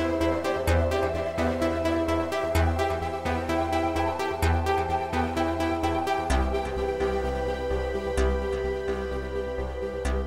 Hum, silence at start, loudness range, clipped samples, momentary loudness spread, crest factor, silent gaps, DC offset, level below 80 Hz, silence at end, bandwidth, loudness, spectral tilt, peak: none; 0 s; 2 LU; under 0.1%; 5 LU; 14 dB; none; 0.4%; -34 dBFS; 0 s; 16 kHz; -27 LUFS; -6 dB/octave; -12 dBFS